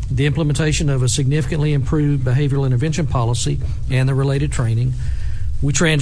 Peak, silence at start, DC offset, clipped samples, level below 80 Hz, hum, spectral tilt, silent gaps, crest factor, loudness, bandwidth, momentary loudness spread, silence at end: -4 dBFS; 0 s; under 0.1%; under 0.1%; -26 dBFS; none; -5.5 dB/octave; none; 14 dB; -18 LUFS; 11 kHz; 5 LU; 0 s